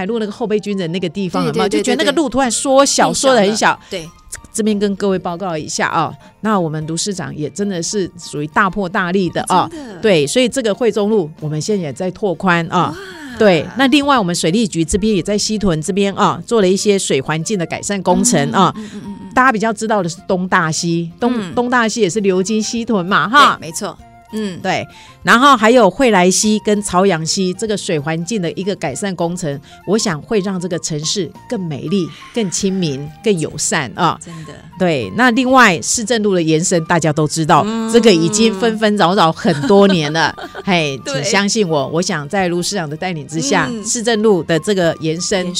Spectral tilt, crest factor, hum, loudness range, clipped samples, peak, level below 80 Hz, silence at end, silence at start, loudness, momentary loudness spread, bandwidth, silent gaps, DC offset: -4 dB/octave; 16 dB; none; 6 LU; under 0.1%; 0 dBFS; -44 dBFS; 0 s; 0 s; -15 LUFS; 10 LU; 16 kHz; none; under 0.1%